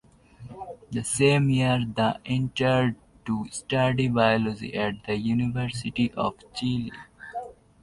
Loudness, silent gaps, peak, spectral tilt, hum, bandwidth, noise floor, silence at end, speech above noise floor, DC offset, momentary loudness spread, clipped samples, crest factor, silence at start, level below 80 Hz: -25 LUFS; none; -8 dBFS; -5.5 dB/octave; none; 11.5 kHz; -46 dBFS; 0.3 s; 22 dB; under 0.1%; 17 LU; under 0.1%; 18 dB; 0.4 s; -52 dBFS